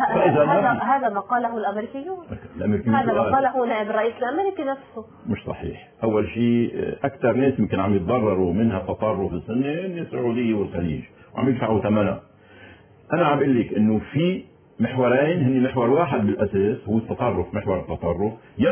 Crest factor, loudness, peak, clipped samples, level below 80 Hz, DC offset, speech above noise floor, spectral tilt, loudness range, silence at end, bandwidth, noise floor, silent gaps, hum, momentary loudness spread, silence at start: 16 dB; -22 LUFS; -6 dBFS; under 0.1%; -46 dBFS; under 0.1%; 26 dB; -11.5 dB/octave; 3 LU; 0 s; 3.5 kHz; -47 dBFS; none; none; 10 LU; 0 s